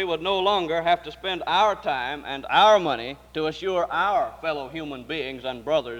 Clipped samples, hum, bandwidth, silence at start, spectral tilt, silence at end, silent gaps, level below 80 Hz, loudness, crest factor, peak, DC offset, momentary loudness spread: under 0.1%; none; 16 kHz; 0 s; -4 dB/octave; 0 s; none; -54 dBFS; -24 LUFS; 18 dB; -6 dBFS; under 0.1%; 13 LU